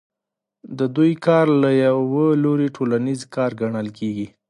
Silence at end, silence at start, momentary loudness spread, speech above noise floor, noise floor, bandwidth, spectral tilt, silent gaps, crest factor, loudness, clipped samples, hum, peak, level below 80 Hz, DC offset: 0.2 s; 0.65 s; 10 LU; 66 dB; -84 dBFS; 11 kHz; -8 dB/octave; none; 16 dB; -19 LUFS; under 0.1%; none; -4 dBFS; -64 dBFS; under 0.1%